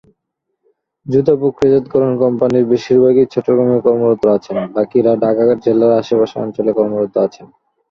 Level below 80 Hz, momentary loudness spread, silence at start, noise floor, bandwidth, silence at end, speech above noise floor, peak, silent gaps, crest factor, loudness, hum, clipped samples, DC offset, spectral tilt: -52 dBFS; 6 LU; 1.05 s; -73 dBFS; 7 kHz; 0.45 s; 60 dB; 0 dBFS; none; 14 dB; -14 LUFS; none; under 0.1%; under 0.1%; -8.5 dB/octave